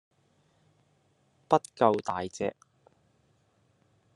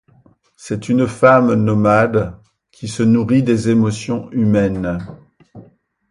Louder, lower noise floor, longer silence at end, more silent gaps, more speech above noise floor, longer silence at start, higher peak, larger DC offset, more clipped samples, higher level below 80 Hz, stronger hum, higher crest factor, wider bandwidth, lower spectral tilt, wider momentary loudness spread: second, -29 LUFS vs -15 LUFS; first, -69 dBFS vs -52 dBFS; first, 1.65 s vs 0.5 s; neither; about the same, 41 dB vs 38 dB; first, 1.5 s vs 0.65 s; second, -8 dBFS vs 0 dBFS; neither; neither; second, -74 dBFS vs -44 dBFS; neither; first, 26 dB vs 16 dB; about the same, 11.5 kHz vs 11 kHz; second, -5.5 dB/octave vs -7.5 dB/octave; second, 10 LU vs 15 LU